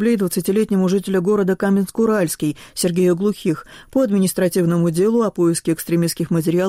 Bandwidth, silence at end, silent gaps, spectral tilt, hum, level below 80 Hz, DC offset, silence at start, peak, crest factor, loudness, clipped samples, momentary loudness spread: 16 kHz; 0 s; none; -6 dB/octave; none; -52 dBFS; under 0.1%; 0 s; -8 dBFS; 10 dB; -18 LUFS; under 0.1%; 5 LU